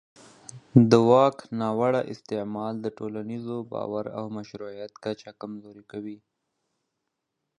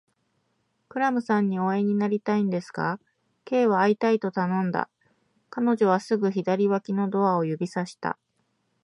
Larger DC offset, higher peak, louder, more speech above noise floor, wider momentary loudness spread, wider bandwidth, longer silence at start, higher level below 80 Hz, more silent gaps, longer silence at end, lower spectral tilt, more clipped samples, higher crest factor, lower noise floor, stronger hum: neither; about the same, -4 dBFS vs -6 dBFS; about the same, -25 LUFS vs -25 LUFS; first, 56 dB vs 49 dB; first, 21 LU vs 10 LU; about the same, 10 kHz vs 10.5 kHz; second, 0.55 s vs 0.95 s; first, -66 dBFS vs -74 dBFS; neither; first, 1.45 s vs 0.7 s; about the same, -7.5 dB/octave vs -7.5 dB/octave; neither; first, 24 dB vs 18 dB; first, -82 dBFS vs -73 dBFS; neither